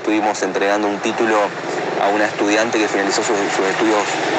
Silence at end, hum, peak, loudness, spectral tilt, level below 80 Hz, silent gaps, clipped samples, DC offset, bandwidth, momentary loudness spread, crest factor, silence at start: 0 s; none; -2 dBFS; -17 LUFS; -3 dB/octave; -70 dBFS; none; under 0.1%; under 0.1%; 9.2 kHz; 3 LU; 16 dB; 0 s